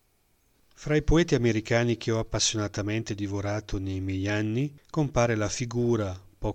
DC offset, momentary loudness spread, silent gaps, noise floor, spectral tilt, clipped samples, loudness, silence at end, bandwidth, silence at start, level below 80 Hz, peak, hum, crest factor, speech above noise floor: under 0.1%; 8 LU; none; -67 dBFS; -5 dB/octave; under 0.1%; -27 LUFS; 0 s; 9.4 kHz; 0.8 s; -40 dBFS; -10 dBFS; none; 16 dB; 41 dB